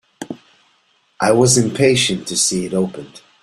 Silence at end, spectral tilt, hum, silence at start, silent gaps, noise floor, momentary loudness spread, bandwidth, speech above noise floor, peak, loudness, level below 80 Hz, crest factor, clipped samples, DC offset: 0.25 s; -3.5 dB/octave; none; 0.2 s; none; -59 dBFS; 20 LU; 14 kHz; 44 dB; 0 dBFS; -15 LUFS; -52 dBFS; 18 dB; under 0.1%; under 0.1%